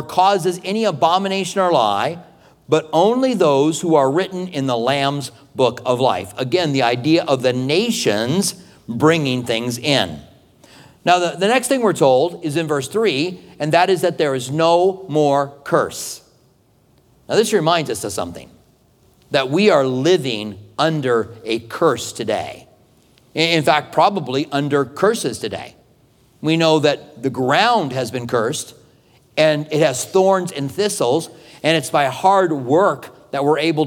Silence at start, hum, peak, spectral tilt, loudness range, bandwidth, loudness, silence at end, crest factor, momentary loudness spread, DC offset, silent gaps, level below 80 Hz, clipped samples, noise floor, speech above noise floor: 0 s; none; 0 dBFS; -4.5 dB/octave; 3 LU; 18.5 kHz; -18 LUFS; 0 s; 18 dB; 10 LU; under 0.1%; none; -60 dBFS; under 0.1%; -56 dBFS; 39 dB